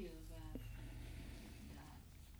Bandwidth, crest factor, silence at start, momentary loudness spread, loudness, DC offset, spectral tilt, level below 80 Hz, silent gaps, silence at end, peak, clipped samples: over 20 kHz; 18 dB; 0 s; 5 LU; -55 LUFS; under 0.1%; -5.5 dB/octave; -56 dBFS; none; 0 s; -36 dBFS; under 0.1%